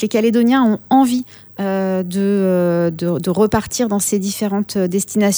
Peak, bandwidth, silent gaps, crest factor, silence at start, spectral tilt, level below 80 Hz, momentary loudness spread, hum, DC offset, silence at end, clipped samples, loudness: -2 dBFS; over 20 kHz; none; 14 dB; 0 s; -5.5 dB/octave; -48 dBFS; 6 LU; none; under 0.1%; 0 s; under 0.1%; -17 LUFS